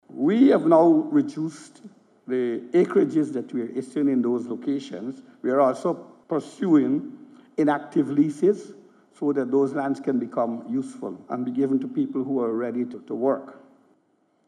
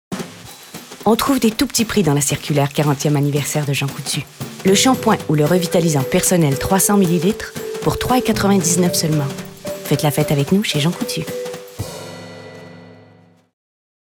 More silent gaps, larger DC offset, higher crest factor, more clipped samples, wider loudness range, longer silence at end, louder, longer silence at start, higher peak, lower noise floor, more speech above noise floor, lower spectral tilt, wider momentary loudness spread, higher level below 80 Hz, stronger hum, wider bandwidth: neither; neither; first, 20 dB vs 14 dB; neither; about the same, 4 LU vs 6 LU; second, 0.95 s vs 1.2 s; second, -24 LUFS vs -17 LUFS; about the same, 0.1 s vs 0.1 s; about the same, -4 dBFS vs -4 dBFS; first, -66 dBFS vs -49 dBFS; first, 43 dB vs 33 dB; first, -7.5 dB/octave vs -4.5 dB/octave; second, 13 LU vs 16 LU; second, -84 dBFS vs -44 dBFS; neither; second, 10.5 kHz vs 19.5 kHz